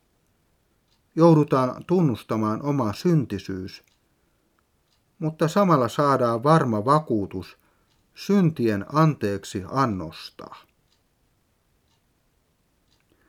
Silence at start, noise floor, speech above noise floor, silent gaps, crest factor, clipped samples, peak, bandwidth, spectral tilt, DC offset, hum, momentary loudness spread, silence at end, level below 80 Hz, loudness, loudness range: 1.15 s; -67 dBFS; 45 dB; none; 20 dB; under 0.1%; -4 dBFS; 15.5 kHz; -7.5 dB/octave; under 0.1%; none; 17 LU; 2.7 s; -62 dBFS; -22 LUFS; 6 LU